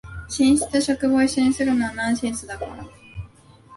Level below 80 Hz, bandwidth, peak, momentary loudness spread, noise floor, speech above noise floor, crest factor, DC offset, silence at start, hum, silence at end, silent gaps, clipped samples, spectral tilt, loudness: -46 dBFS; 11.5 kHz; -8 dBFS; 21 LU; -49 dBFS; 28 dB; 14 dB; under 0.1%; 0.05 s; none; 0 s; none; under 0.1%; -4 dB/octave; -21 LUFS